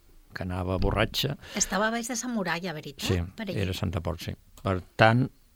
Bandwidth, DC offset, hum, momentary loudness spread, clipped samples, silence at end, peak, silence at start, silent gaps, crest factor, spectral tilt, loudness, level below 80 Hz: 17.5 kHz; under 0.1%; none; 13 LU; under 0.1%; 0.3 s; -4 dBFS; 0.35 s; none; 24 dB; -4.5 dB/octave; -28 LUFS; -42 dBFS